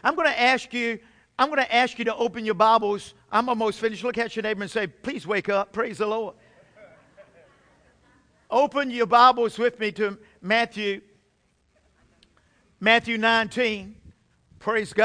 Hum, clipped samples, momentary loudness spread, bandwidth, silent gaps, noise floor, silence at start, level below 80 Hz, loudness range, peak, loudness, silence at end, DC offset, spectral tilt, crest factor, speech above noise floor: none; under 0.1%; 11 LU; 10.5 kHz; none; -67 dBFS; 0 s; -62 dBFS; 7 LU; -2 dBFS; -23 LUFS; 0 s; under 0.1%; -4 dB/octave; 22 dB; 44 dB